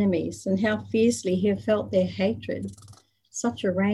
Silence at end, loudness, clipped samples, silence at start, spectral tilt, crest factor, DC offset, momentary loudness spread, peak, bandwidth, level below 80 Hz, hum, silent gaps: 0 s; -26 LUFS; under 0.1%; 0 s; -6 dB/octave; 14 dB; under 0.1%; 10 LU; -10 dBFS; 12 kHz; -54 dBFS; none; none